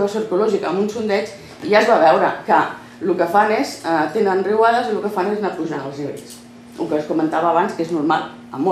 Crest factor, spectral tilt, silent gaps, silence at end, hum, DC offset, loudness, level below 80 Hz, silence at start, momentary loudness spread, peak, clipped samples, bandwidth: 16 dB; -5.5 dB/octave; none; 0 s; none; under 0.1%; -18 LUFS; -64 dBFS; 0 s; 14 LU; -2 dBFS; under 0.1%; 14.5 kHz